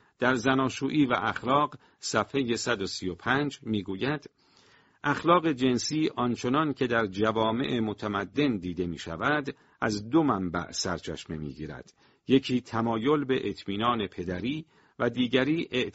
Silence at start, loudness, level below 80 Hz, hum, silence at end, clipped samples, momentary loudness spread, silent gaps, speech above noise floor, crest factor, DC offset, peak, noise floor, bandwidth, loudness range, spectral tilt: 0.2 s; -28 LUFS; -58 dBFS; none; 0.05 s; under 0.1%; 9 LU; none; 33 dB; 20 dB; under 0.1%; -8 dBFS; -61 dBFS; 8 kHz; 3 LU; -4 dB/octave